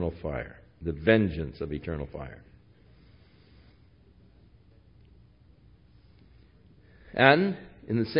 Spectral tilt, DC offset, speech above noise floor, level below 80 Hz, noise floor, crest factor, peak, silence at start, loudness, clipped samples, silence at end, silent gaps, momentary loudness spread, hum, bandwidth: -10 dB/octave; under 0.1%; 31 dB; -50 dBFS; -58 dBFS; 28 dB; -2 dBFS; 0 s; -27 LUFS; under 0.1%; 0 s; none; 20 LU; none; 5.4 kHz